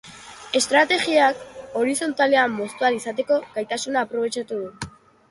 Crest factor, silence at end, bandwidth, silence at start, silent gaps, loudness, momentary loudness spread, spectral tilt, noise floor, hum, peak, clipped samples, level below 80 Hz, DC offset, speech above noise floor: 18 dB; 0.4 s; 11.5 kHz; 0.05 s; none; -21 LUFS; 16 LU; -2.5 dB/octave; -42 dBFS; none; -4 dBFS; under 0.1%; -60 dBFS; under 0.1%; 20 dB